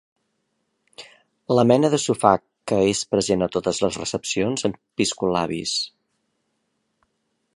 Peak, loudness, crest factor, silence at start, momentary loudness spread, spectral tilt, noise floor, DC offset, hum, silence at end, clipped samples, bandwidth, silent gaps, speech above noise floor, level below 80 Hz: -2 dBFS; -22 LUFS; 22 dB; 1 s; 8 LU; -4.5 dB/octave; -73 dBFS; under 0.1%; none; 1.7 s; under 0.1%; 11.5 kHz; none; 52 dB; -54 dBFS